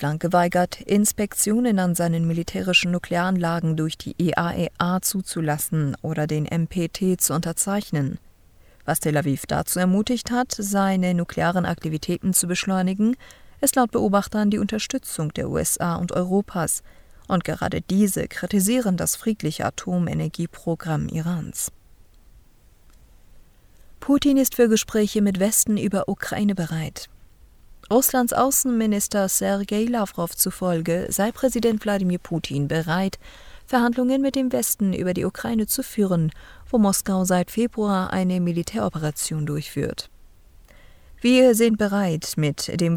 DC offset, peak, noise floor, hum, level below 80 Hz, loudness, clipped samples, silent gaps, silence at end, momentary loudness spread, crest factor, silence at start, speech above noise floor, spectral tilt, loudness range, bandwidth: under 0.1%; -4 dBFS; -52 dBFS; none; -48 dBFS; -22 LUFS; under 0.1%; none; 0 s; 8 LU; 18 dB; 0 s; 30 dB; -4.5 dB/octave; 4 LU; over 20 kHz